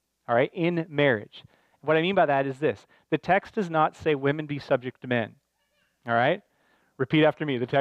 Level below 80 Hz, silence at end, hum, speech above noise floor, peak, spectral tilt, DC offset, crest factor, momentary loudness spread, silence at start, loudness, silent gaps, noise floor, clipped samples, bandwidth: -66 dBFS; 0 s; none; 46 dB; -10 dBFS; -7.5 dB/octave; under 0.1%; 18 dB; 10 LU; 0.3 s; -26 LUFS; none; -72 dBFS; under 0.1%; 8.8 kHz